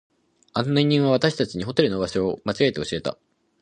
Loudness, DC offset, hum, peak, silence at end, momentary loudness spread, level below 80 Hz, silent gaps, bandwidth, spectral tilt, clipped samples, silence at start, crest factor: -23 LUFS; under 0.1%; none; -2 dBFS; 0.5 s; 9 LU; -54 dBFS; none; 10 kHz; -6 dB/octave; under 0.1%; 0.55 s; 22 dB